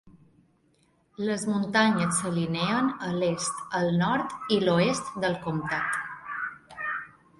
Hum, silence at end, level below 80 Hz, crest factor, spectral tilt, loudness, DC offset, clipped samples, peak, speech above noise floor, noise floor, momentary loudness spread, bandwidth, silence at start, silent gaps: none; 0.3 s; -62 dBFS; 18 dB; -4.5 dB/octave; -27 LUFS; under 0.1%; under 0.1%; -10 dBFS; 40 dB; -66 dBFS; 11 LU; 11.5 kHz; 0.05 s; none